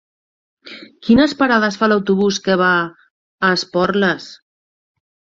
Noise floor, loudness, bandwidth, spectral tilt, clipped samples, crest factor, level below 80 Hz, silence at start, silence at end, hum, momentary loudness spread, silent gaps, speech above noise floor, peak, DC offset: under -90 dBFS; -16 LUFS; 7.8 kHz; -5 dB/octave; under 0.1%; 16 dB; -52 dBFS; 0.65 s; 1.05 s; none; 17 LU; 3.11-3.38 s; over 75 dB; -2 dBFS; under 0.1%